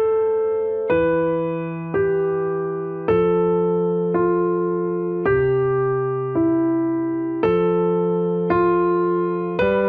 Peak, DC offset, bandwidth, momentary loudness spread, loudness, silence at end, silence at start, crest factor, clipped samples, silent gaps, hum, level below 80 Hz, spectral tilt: -6 dBFS; under 0.1%; 4.8 kHz; 5 LU; -20 LUFS; 0 s; 0 s; 12 dB; under 0.1%; none; none; -48 dBFS; -11 dB/octave